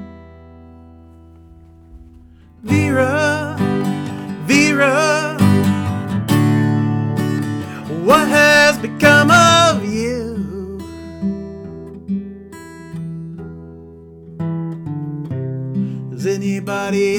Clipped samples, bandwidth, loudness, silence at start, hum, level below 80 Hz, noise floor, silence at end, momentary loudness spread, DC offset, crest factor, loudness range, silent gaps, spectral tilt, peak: under 0.1%; 19.5 kHz; -16 LUFS; 0 s; none; -48 dBFS; -43 dBFS; 0 s; 22 LU; under 0.1%; 14 dB; 16 LU; none; -5 dB/octave; -4 dBFS